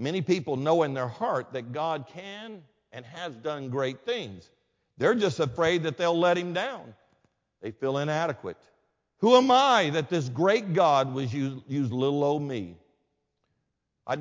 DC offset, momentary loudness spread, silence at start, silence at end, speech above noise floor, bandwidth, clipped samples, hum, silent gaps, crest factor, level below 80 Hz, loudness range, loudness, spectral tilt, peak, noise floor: under 0.1%; 19 LU; 0 s; 0 s; 53 dB; 7.6 kHz; under 0.1%; none; none; 22 dB; -66 dBFS; 9 LU; -26 LUFS; -5.5 dB/octave; -6 dBFS; -79 dBFS